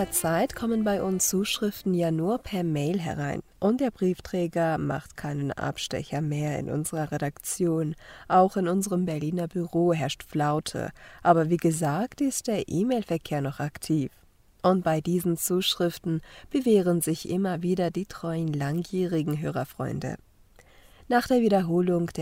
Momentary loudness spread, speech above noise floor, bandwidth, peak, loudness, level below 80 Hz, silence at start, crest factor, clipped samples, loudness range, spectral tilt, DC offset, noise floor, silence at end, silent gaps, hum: 9 LU; 29 dB; 16 kHz; -6 dBFS; -27 LUFS; -56 dBFS; 0 s; 20 dB; under 0.1%; 4 LU; -5.5 dB/octave; under 0.1%; -56 dBFS; 0 s; none; none